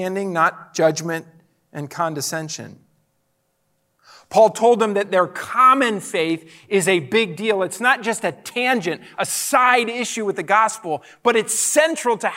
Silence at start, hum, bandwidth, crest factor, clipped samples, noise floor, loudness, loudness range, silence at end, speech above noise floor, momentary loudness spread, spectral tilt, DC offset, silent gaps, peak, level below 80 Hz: 0 s; none; 16 kHz; 18 dB; under 0.1%; -68 dBFS; -19 LUFS; 8 LU; 0 s; 49 dB; 12 LU; -3 dB/octave; under 0.1%; none; -2 dBFS; -74 dBFS